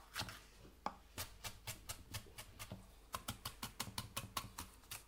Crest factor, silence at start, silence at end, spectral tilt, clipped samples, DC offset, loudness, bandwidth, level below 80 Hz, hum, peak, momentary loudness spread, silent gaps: 26 dB; 0 s; 0 s; -2.5 dB/octave; under 0.1%; under 0.1%; -49 LUFS; 17.5 kHz; -62 dBFS; none; -24 dBFS; 8 LU; none